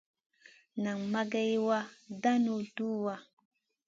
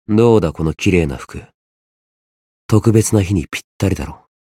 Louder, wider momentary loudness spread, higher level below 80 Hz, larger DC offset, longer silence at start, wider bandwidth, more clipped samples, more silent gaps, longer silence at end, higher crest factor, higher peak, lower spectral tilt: second, -33 LUFS vs -16 LUFS; second, 11 LU vs 17 LU; second, -82 dBFS vs -38 dBFS; neither; first, 0.75 s vs 0.1 s; second, 7.6 kHz vs 15.5 kHz; neither; second, none vs 1.54-2.69 s, 3.64-3.80 s; first, 0.65 s vs 0.25 s; about the same, 18 dB vs 16 dB; second, -16 dBFS vs 0 dBFS; about the same, -6 dB/octave vs -6.5 dB/octave